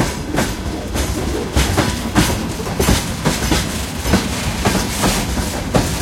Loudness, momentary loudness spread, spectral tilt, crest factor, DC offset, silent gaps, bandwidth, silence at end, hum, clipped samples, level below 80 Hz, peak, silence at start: -18 LUFS; 5 LU; -4 dB/octave; 18 dB; under 0.1%; none; 16.5 kHz; 0 s; none; under 0.1%; -26 dBFS; 0 dBFS; 0 s